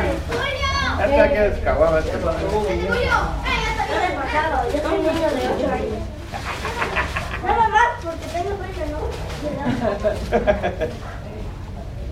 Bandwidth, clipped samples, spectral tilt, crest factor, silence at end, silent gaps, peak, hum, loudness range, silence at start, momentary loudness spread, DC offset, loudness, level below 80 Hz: 15.5 kHz; under 0.1%; -5.5 dB/octave; 20 dB; 0 s; none; -2 dBFS; none; 5 LU; 0 s; 12 LU; under 0.1%; -21 LUFS; -30 dBFS